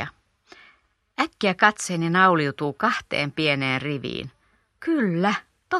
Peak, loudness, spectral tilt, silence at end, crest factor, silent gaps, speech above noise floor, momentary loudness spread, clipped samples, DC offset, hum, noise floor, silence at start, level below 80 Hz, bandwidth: -2 dBFS; -23 LUFS; -4.5 dB/octave; 0 s; 24 dB; none; 39 dB; 14 LU; under 0.1%; under 0.1%; none; -61 dBFS; 0 s; -62 dBFS; 13 kHz